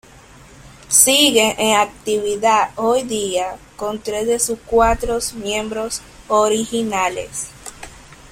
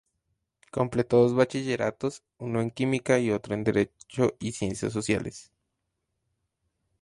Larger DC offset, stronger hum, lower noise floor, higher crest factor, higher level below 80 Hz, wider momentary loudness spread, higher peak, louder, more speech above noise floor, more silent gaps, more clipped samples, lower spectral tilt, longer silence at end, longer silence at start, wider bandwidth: neither; neither; second, -43 dBFS vs -81 dBFS; about the same, 18 dB vs 20 dB; first, -40 dBFS vs -58 dBFS; first, 16 LU vs 11 LU; first, 0 dBFS vs -8 dBFS; first, -17 LUFS vs -27 LUFS; second, 26 dB vs 54 dB; neither; neither; second, -1.5 dB/octave vs -6 dB/octave; second, 0.15 s vs 1.6 s; about the same, 0.65 s vs 0.75 s; first, 16.5 kHz vs 11.5 kHz